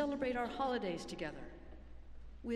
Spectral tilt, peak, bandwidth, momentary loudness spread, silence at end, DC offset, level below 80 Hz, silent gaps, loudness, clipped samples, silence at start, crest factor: -5.5 dB/octave; -24 dBFS; 12.5 kHz; 21 LU; 0 s; under 0.1%; -56 dBFS; none; -40 LUFS; under 0.1%; 0 s; 16 dB